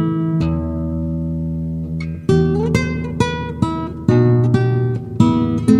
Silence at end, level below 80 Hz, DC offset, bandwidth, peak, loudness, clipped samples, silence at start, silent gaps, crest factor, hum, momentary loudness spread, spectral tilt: 0 s; -34 dBFS; under 0.1%; 11 kHz; 0 dBFS; -18 LUFS; under 0.1%; 0 s; none; 16 dB; none; 8 LU; -8 dB/octave